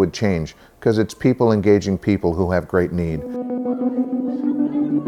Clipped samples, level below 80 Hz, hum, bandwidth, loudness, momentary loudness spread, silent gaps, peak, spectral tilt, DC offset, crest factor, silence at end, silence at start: under 0.1%; -42 dBFS; none; 13.5 kHz; -20 LUFS; 8 LU; none; -4 dBFS; -7.5 dB/octave; under 0.1%; 16 dB; 0 s; 0 s